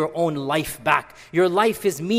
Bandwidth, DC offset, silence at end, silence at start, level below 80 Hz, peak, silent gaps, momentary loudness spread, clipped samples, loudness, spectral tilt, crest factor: 16 kHz; under 0.1%; 0 s; 0 s; -54 dBFS; -2 dBFS; none; 6 LU; under 0.1%; -22 LUFS; -5 dB/octave; 20 dB